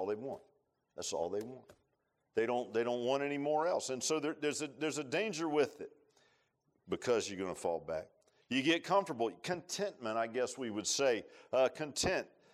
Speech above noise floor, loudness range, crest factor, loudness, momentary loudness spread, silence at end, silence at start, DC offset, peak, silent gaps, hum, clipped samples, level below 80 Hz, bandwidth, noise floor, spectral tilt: 45 dB; 3 LU; 18 dB; -36 LUFS; 10 LU; 0.25 s; 0 s; under 0.1%; -18 dBFS; none; none; under 0.1%; -70 dBFS; 15 kHz; -81 dBFS; -3.5 dB/octave